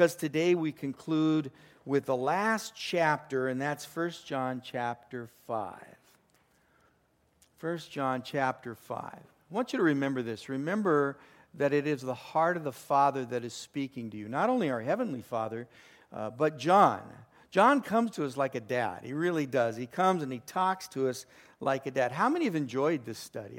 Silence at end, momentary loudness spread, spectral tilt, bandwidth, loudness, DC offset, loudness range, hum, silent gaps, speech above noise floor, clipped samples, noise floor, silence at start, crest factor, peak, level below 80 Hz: 0 s; 13 LU; -5.5 dB/octave; 16.5 kHz; -30 LUFS; under 0.1%; 9 LU; none; none; 40 dB; under 0.1%; -70 dBFS; 0 s; 22 dB; -8 dBFS; -76 dBFS